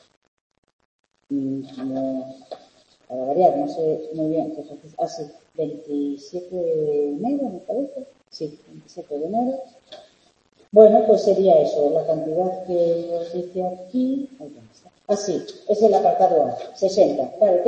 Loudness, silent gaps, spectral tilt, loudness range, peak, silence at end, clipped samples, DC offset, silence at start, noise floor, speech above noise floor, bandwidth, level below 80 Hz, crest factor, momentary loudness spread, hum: -21 LUFS; none; -7 dB/octave; 9 LU; 0 dBFS; 0 s; under 0.1%; under 0.1%; 1.3 s; -60 dBFS; 39 dB; 8.6 kHz; -70 dBFS; 20 dB; 19 LU; none